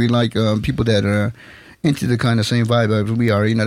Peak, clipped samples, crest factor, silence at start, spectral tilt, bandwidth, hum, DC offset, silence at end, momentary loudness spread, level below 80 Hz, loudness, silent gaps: -6 dBFS; under 0.1%; 12 dB; 0 s; -6.5 dB/octave; 14 kHz; none; under 0.1%; 0 s; 4 LU; -42 dBFS; -18 LUFS; none